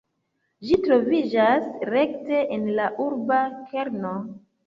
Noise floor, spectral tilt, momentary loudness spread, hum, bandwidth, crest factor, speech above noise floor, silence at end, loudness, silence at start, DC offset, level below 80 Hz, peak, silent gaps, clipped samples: -74 dBFS; -7.5 dB/octave; 10 LU; none; 7.4 kHz; 18 dB; 51 dB; 0.3 s; -23 LUFS; 0.6 s; under 0.1%; -58 dBFS; -6 dBFS; none; under 0.1%